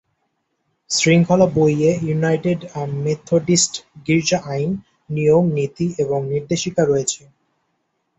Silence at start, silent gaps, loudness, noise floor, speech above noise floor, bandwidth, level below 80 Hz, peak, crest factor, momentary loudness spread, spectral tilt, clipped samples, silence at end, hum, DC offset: 0.9 s; none; -18 LUFS; -71 dBFS; 53 dB; 8.2 kHz; -54 dBFS; -2 dBFS; 16 dB; 10 LU; -5 dB/octave; under 0.1%; 1 s; none; under 0.1%